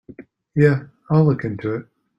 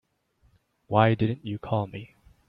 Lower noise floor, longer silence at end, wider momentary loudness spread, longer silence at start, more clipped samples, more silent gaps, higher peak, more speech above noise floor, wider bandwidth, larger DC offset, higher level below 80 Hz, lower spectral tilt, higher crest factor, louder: second, -43 dBFS vs -67 dBFS; about the same, 0.35 s vs 0.45 s; second, 10 LU vs 14 LU; second, 0.2 s vs 0.9 s; neither; neither; about the same, -2 dBFS vs -4 dBFS; second, 26 dB vs 41 dB; first, 5.6 kHz vs 4.9 kHz; neither; first, -52 dBFS vs -58 dBFS; about the same, -10 dB/octave vs -10 dB/octave; second, 18 dB vs 24 dB; first, -20 LUFS vs -26 LUFS